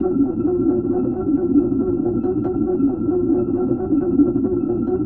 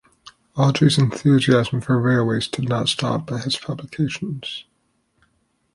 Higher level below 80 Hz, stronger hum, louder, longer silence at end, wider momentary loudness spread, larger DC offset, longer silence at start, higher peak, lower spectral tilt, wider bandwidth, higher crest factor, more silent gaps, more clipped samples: first, -40 dBFS vs -54 dBFS; neither; about the same, -19 LUFS vs -20 LUFS; second, 0 s vs 1.15 s; second, 3 LU vs 13 LU; neither; second, 0 s vs 0.55 s; about the same, -4 dBFS vs -4 dBFS; first, -14 dB/octave vs -6 dB/octave; second, 2.7 kHz vs 11.5 kHz; about the same, 14 dB vs 18 dB; neither; neither